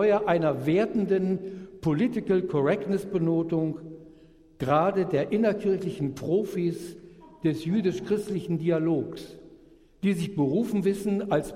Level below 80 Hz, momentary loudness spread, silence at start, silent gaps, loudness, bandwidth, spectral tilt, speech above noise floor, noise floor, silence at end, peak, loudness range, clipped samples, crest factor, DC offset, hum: -58 dBFS; 8 LU; 0 s; none; -27 LUFS; 15.5 kHz; -7.5 dB/octave; 28 dB; -54 dBFS; 0 s; -8 dBFS; 3 LU; under 0.1%; 18 dB; under 0.1%; none